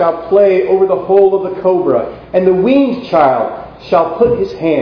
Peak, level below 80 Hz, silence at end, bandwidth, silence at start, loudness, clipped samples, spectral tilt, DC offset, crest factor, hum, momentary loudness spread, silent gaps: 0 dBFS; -44 dBFS; 0 s; 5.4 kHz; 0 s; -12 LUFS; 0.1%; -9 dB/octave; under 0.1%; 12 dB; none; 6 LU; none